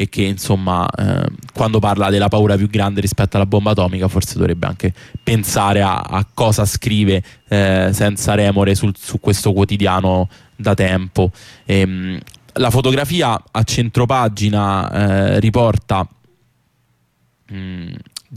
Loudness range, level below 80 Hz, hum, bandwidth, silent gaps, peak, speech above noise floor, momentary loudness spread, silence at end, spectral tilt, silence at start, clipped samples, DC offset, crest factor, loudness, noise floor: 2 LU; -38 dBFS; none; 15.5 kHz; none; -4 dBFS; 46 dB; 9 LU; 0 s; -5.5 dB/octave; 0 s; under 0.1%; under 0.1%; 12 dB; -16 LUFS; -61 dBFS